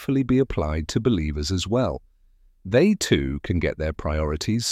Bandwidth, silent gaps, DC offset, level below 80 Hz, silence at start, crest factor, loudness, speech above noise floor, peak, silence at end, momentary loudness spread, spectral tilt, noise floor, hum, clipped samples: 15.5 kHz; none; under 0.1%; -34 dBFS; 0 s; 16 dB; -23 LUFS; 34 dB; -6 dBFS; 0 s; 7 LU; -5.5 dB/octave; -57 dBFS; none; under 0.1%